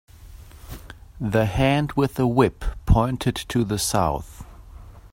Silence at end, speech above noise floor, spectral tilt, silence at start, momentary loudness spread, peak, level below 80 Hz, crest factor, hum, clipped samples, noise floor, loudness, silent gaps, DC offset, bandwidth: 0.05 s; 22 dB; -5.5 dB/octave; 0.2 s; 21 LU; -4 dBFS; -34 dBFS; 18 dB; none; under 0.1%; -43 dBFS; -22 LUFS; none; under 0.1%; 16.5 kHz